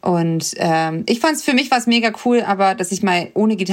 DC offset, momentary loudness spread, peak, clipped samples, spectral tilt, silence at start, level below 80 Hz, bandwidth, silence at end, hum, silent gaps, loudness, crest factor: under 0.1%; 4 LU; -2 dBFS; under 0.1%; -4.5 dB/octave; 0.05 s; -64 dBFS; 16.5 kHz; 0 s; none; none; -17 LUFS; 14 dB